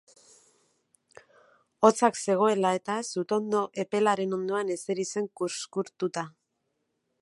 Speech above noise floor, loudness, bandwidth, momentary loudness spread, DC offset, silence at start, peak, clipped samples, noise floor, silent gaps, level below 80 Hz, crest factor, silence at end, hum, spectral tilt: 51 dB; -28 LUFS; 11.5 kHz; 9 LU; under 0.1%; 1.8 s; -6 dBFS; under 0.1%; -78 dBFS; none; -78 dBFS; 24 dB; 0.9 s; none; -4.5 dB/octave